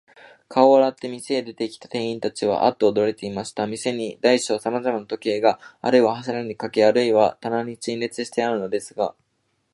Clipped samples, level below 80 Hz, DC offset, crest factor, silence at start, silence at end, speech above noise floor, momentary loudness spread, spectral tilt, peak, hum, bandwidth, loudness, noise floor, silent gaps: under 0.1%; -66 dBFS; under 0.1%; 20 dB; 0.5 s; 0.6 s; 49 dB; 10 LU; -4.5 dB/octave; -2 dBFS; none; 11.5 kHz; -22 LUFS; -71 dBFS; none